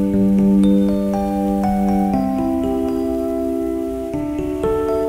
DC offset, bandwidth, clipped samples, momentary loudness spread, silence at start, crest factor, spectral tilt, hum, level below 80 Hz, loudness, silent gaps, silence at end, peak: under 0.1%; 15.5 kHz; under 0.1%; 9 LU; 0 s; 12 dB; -8.5 dB/octave; none; -36 dBFS; -18 LUFS; none; 0 s; -6 dBFS